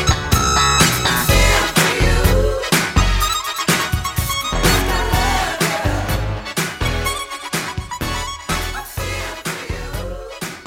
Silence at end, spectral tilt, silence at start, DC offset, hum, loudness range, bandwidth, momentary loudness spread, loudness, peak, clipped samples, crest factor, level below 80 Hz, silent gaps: 0 s; -3.5 dB/octave; 0 s; under 0.1%; none; 8 LU; 17 kHz; 12 LU; -18 LUFS; 0 dBFS; under 0.1%; 18 dB; -24 dBFS; none